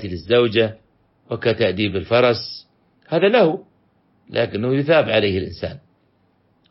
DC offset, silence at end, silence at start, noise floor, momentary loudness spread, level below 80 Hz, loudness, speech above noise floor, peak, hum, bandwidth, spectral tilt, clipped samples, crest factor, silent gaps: under 0.1%; 0.9 s; 0 s; -61 dBFS; 15 LU; -52 dBFS; -19 LUFS; 43 dB; -4 dBFS; none; 5.8 kHz; -9.5 dB/octave; under 0.1%; 16 dB; none